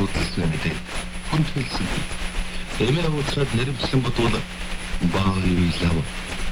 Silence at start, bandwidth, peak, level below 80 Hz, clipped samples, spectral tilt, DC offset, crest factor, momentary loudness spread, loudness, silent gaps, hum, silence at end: 0 s; 16 kHz; -8 dBFS; -30 dBFS; under 0.1%; -5.5 dB/octave; under 0.1%; 14 dB; 9 LU; -24 LUFS; none; none; 0 s